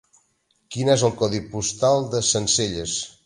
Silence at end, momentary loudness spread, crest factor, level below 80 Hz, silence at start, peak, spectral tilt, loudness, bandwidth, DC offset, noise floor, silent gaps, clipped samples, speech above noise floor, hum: 0.15 s; 7 LU; 18 dB; -50 dBFS; 0.7 s; -4 dBFS; -3.5 dB/octave; -21 LUFS; 11.5 kHz; under 0.1%; -67 dBFS; none; under 0.1%; 45 dB; none